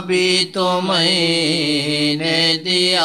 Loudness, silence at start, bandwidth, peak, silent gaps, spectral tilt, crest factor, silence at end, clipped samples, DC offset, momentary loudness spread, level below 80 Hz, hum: -16 LUFS; 0 s; 13.5 kHz; -4 dBFS; none; -3.5 dB/octave; 14 dB; 0 s; under 0.1%; 0.2%; 3 LU; -64 dBFS; none